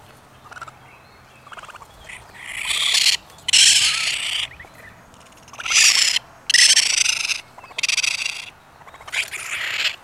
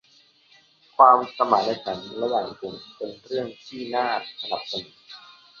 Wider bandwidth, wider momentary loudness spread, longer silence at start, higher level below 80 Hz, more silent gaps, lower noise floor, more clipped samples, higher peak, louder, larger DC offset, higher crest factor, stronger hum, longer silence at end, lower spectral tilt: first, over 20 kHz vs 7 kHz; first, 26 LU vs 21 LU; second, 0.45 s vs 1 s; first, -58 dBFS vs -68 dBFS; neither; second, -47 dBFS vs -58 dBFS; neither; about the same, 0 dBFS vs -2 dBFS; first, -16 LUFS vs -23 LUFS; neither; about the same, 22 dB vs 24 dB; neither; second, 0.1 s vs 0.4 s; second, 3 dB/octave vs -5 dB/octave